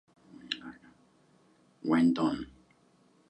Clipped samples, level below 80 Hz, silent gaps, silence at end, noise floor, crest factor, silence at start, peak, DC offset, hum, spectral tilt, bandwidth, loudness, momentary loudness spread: under 0.1%; -66 dBFS; none; 0.85 s; -65 dBFS; 18 dB; 0.45 s; -16 dBFS; under 0.1%; none; -6 dB/octave; 8.6 kHz; -30 LUFS; 19 LU